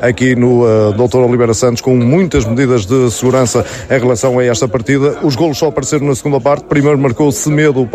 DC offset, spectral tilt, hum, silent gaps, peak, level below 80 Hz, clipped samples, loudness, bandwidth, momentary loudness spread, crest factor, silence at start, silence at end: under 0.1%; -6 dB/octave; none; none; 0 dBFS; -36 dBFS; under 0.1%; -11 LUFS; 15.5 kHz; 4 LU; 10 dB; 0 s; 0.05 s